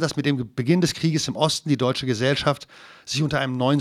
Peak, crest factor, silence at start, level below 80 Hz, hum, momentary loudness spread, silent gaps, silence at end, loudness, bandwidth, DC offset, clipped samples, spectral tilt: -4 dBFS; 20 dB; 0 s; -54 dBFS; none; 7 LU; none; 0 s; -23 LUFS; 14.5 kHz; under 0.1%; under 0.1%; -5 dB/octave